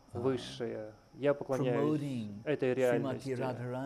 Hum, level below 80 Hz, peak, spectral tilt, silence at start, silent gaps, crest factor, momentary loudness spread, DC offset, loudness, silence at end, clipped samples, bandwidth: none; -68 dBFS; -18 dBFS; -7 dB/octave; 0.15 s; none; 16 dB; 9 LU; under 0.1%; -34 LUFS; 0 s; under 0.1%; 15.5 kHz